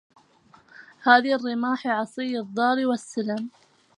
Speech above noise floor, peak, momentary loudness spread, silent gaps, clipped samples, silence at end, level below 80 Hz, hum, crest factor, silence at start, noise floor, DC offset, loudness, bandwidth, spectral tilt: 33 dB; -2 dBFS; 11 LU; none; under 0.1%; 0.5 s; -80 dBFS; none; 24 dB; 0.8 s; -57 dBFS; under 0.1%; -24 LUFS; 11 kHz; -4.5 dB/octave